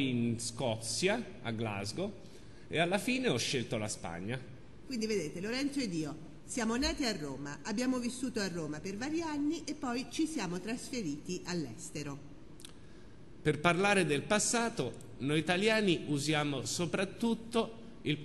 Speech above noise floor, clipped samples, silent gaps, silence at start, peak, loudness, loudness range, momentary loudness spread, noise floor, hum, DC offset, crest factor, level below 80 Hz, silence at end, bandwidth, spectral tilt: 20 dB; under 0.1%; none; 0 s; -12 dBFS; -34 LUFS; 7 LU; 12 LU; -54 dBFS; none; 0.3%; 24 dB; -58 dBFS; 0 s; 12.5 kHz; -4 dB/octave